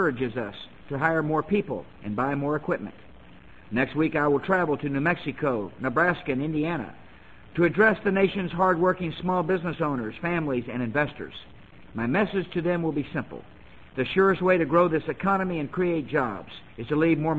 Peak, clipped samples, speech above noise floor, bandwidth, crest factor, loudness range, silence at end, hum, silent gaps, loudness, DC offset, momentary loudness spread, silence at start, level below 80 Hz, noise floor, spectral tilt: -8 dBFS; under 0.1%; 25 dB; 8 kHz; 18 dB; 4 LU; 0 s; none; none; -26 LUFS; 0.3%; 13 LU; 0 s; -54 dBFS; -50 dBFS; -8.5 dB/octave